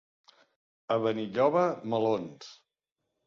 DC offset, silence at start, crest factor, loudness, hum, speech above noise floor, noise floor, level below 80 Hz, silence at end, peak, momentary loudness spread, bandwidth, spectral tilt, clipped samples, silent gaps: under 0.1%; 0.9 s; 20 dB; -29 LUFS; none; 57 dB; -85 dBFS; -74 dBFS; 0.7 s; -12 dBFS; 19 LU; 7.2 kHz; -7 dB/octave; under 0.1%; none